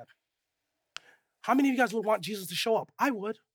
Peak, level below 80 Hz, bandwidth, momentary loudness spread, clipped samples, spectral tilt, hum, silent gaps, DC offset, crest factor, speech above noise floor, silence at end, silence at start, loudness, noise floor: -12 dBFS; -86 dBFS; 18.5 kHz; 21 LU; under 0.1%; -4 dB/octave; none; none; under 0.1%; 20 dB; 56 dB; 0.2 s; 0 s; -29 LUFS; -84 dBFS